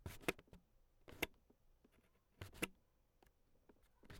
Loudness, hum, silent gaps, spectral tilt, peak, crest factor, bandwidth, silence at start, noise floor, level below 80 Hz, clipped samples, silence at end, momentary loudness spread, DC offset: -48 LUFS; none; none; -3.5 dB/octave; -22 dBFS; 32 dB; 18 kHz; 0 s; -76 dBFS; -68 dBFS; under 0.1%; 0 s; 16 LU; under 0.1%